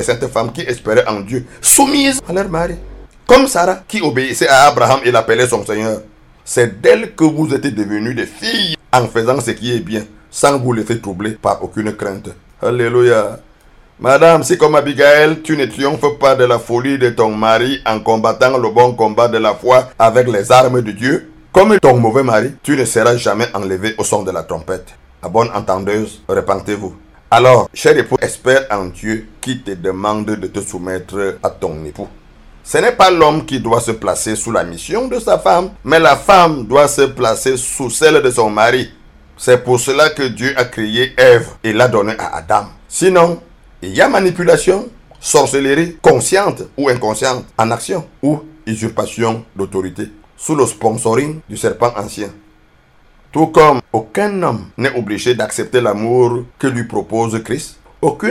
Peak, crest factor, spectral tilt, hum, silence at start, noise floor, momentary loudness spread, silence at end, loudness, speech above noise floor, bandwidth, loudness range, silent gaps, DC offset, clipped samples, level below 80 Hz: 0 dBFS; 14 dB; -4 dB/octave; none; 0 s; -48 dBFS; 13 LU; 0 s; -13 LUFS; 36 dB; 17.5 kHz; 7 LU; none; under 0.1%; 0.2%; -42 dBFS